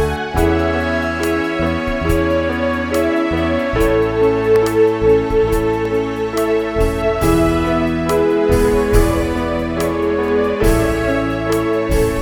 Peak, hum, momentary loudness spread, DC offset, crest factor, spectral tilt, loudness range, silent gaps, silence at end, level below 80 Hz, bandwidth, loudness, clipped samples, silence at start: 0 dBFS; none; 4 LU; under 0.1%; 16 dB; -6 dB/octave; 2 LU; none; 0 s; -26 dBFS; over 20 kHz; -16 LUFS; under 0.1%; 0 s